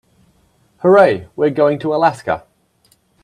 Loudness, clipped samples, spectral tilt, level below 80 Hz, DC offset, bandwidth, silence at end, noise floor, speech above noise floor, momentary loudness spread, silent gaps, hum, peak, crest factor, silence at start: -15 LUFS; under 0.1%; -7 dB/octave; -56 dBFS; under 0.1%; 10.5 kHz; 0.85 s; -57 dBFS; 44 dB; 12 LU; none; none; 0 dBFS; 16 dB; 0.85 s